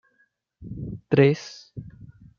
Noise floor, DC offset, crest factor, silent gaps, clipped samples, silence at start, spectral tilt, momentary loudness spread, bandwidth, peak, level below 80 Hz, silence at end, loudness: -68 dBFS; under 0.1%; 22 dB; none; under 0.1%; 0.6 s; -7.5 dB/octave; 23 LU; 7.2 kHz; -4 dBFS; -54 dBFS; 0.5 s; -22 LUFS